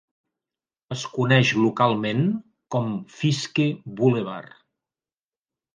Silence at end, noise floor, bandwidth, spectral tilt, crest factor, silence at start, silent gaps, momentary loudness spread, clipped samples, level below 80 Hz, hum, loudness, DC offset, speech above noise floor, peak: 1.3 s; under -90 dBFS; 9.6 kHz; -6 dB/octave; 20 dB; 0.9 s; none; 14 LU; under 0.1%; -66 dBFS; none; -23 LUFS; under 0.1%; over 68 dB; -4 dBFS